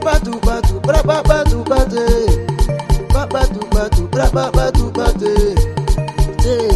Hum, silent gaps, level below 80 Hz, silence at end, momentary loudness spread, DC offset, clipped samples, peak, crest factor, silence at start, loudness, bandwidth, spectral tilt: none; none; -16 dBFS; 0 s; 4 LU; under 0.1%; under 0.1%; 0 dBFS; 14 dB; 0 s; -16 LUFS; 13.5 kHz; -6 dB/octave